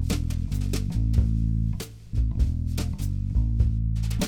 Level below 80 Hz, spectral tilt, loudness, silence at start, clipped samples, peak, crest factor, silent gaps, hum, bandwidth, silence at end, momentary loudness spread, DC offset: -28 dBFS; -6.5 dB/octave; -27 LUFS; 0 s; under 0.1%; -10 dBFS; 14 dB; none; none; 16.5 kHz; 0 s; 5 LU; under 0.1%